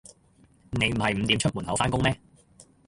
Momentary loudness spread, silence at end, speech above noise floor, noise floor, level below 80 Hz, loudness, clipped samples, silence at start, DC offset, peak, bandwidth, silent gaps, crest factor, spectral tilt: 6 LU; 0.25 s; 34 dB; -60 dBFS; -46 dBFS; -25 LUFS; under 0.1%; 0.7 s; under 0.1%; -8 dBFS; 11.5 kHz; none; 20 dB; -4.5 dB/octave